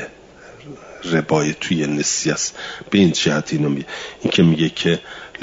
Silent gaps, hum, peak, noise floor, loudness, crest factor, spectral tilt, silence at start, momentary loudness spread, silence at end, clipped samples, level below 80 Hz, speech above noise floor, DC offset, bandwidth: none; none; -2 dBFS; -43 dBFS; -18 LUFS; 18 dB; -4.5 dB/octave; 0 s; 17 LU; 0 s; under 0.1%; -54 dBFS; 23 dB; under 0.1%; 7.8 kHz